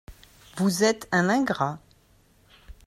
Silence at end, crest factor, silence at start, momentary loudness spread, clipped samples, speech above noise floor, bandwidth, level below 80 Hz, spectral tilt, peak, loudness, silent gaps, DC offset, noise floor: 0.15 s; 18 dB; 0.1 s; 14 LU; under 0.1%; 36 dB; 15 kHz; -56 dBFS; -5 dB/octave; -10 dBFS; -24 LUFS; none; under 0.1%; -60 dBFS